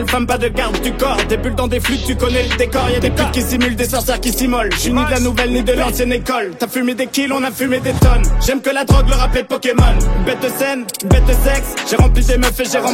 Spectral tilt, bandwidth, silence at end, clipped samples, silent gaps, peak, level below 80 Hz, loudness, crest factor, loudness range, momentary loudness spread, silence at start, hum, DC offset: -4.5 dB/octave; 16.5 kHz; 0 s; under 0.1%; none; -2 dBFS; -18 dBFS; -15 LUFS; 12 dB; 1 LU; 4 LU; 0 s; none; under 0.1%